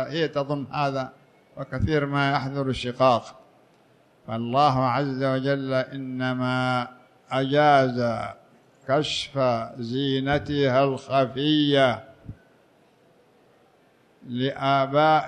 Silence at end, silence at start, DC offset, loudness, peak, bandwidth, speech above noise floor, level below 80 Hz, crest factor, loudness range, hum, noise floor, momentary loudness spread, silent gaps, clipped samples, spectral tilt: 0 s; 0 s; under 0.1%; -24 LUFS; -6 dBFS; 10 kHz; 36 dB; -52 dBFS; 18 dB; 3 LU; none; -60 dBFS; 12 LU; none; under 0.1%; -6.5 dB/octave